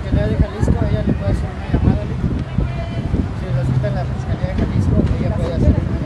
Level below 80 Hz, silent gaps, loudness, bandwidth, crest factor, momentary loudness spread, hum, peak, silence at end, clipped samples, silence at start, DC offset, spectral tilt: -24 dBFS; none; -19 LUFS; 10.5 kHz; 16 dB; 5 LU; none; -2 dBFS; 0 s; under 0.1%; 0 s; under 0.1%; -8.5 dB/octave